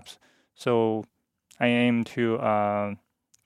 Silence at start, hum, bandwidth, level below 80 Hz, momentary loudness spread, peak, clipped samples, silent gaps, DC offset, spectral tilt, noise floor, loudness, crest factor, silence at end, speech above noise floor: 0.05 s; none; 11.5 kHz; -72 dBFS; 11 LU; -8 dBFS; under 0.1%; none; under 0.1%; -6.5 dB/octave; -52 dBFS; -26 LUFS; 20 dB; 0.5 s; 27 dB